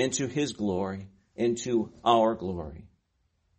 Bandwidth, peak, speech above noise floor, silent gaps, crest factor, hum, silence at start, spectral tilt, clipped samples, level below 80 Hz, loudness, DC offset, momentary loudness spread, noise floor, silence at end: 8.4 kHz; -8 dBFS; 46 dB; none; 22 dB; none; 0 s; -4.5 dB/octave; under 0.1%; -56 dBFS; -28 LUFS; under 0.1%; 16 LU; -73 dBFS; 0.7 s